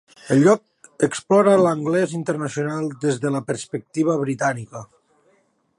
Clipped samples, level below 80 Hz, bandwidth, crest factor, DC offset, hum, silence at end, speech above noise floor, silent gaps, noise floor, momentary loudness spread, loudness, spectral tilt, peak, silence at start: under 0.1%; -66 dBFS; 11.5 kHz; 18 dB; under 0.1%; none; 0.95 s; 43 dB; none; -63 dBFS; 12 LU; -20 LUFS; -6 dB/octave; -4 dBFS; 0.25 s